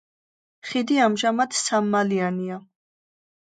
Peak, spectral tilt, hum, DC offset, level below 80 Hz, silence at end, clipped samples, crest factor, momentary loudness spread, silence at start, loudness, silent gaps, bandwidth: -6 dBFS; -4 dB/octave; none; under 0.1%; -76 dBFS; 0.9 s; under 0.1%; 18 dB; 12 LU; 0.65 s; -22 LUFS; none; 9.4 kHz